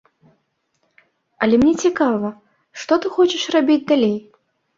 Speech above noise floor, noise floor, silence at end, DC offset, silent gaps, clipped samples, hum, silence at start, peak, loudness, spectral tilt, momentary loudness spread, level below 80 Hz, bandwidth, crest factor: 52 dB; -68 dBFS; 0.6 s; under 0.1%; none; under 0.1%; none; 1.4 s; -2 dBFS; -18 LUFS; -4.5 dB/octave; 14 LU; -54 dBFS; 7.8 kHz; 18 dB